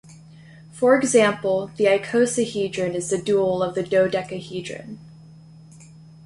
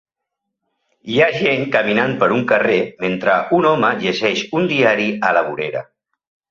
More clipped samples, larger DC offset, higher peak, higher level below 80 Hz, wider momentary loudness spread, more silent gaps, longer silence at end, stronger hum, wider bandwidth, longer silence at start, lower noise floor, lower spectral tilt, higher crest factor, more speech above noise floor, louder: neither; neither; about the same, -4 dBFS vs -2 dBFS; about the same, -60 dBFS vs -58 dBFS; first, 14 LU vs 7 LU; neither; first, 0.95 s vs 0.65 s; neither; first, 11.5 kHz vs 7.4 kHz; second, 0.1 s vs 1.05 s; second, -45 dBFS vs -79 dBFS; about the same, -4.5 dB/octave vs -5.5 dB/octave; about the same, 18 dB vs 16 dB; second, 25 dB vs 63 dB; second, -21 LUFS vs -16 LUFS